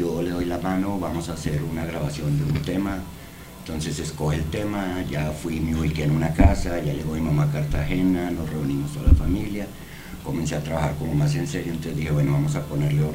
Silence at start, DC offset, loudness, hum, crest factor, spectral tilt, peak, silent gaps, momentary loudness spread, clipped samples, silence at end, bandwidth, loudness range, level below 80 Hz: 0 s; 0.4%; -25 LUFS; none; 20 dB; -7 dB/octave; -4 dBFS; none; 10 LU; under 0.1%; 0 s; 16 kHz; 4 LU; -32 dBFS